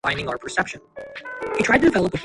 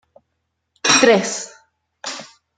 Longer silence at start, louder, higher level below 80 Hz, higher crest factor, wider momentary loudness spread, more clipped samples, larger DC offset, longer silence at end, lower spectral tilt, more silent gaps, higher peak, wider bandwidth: second, 0.05 s vs 0.85 s; second, -21 LUFS vs -15 LUFS; first, -46 dBFS vs -66 dBFS; about the same, 18 dB vs 20 dB; about the same, 19 LU vs 21 LU; neither; neither; second, 0 s vs 0.35 s; first, -5 dB/octave vs -2 dB/octave; neither; about the same, -4 dBFS vs -2 dBFS; about the same, 11.5 kHz vs 11 kHz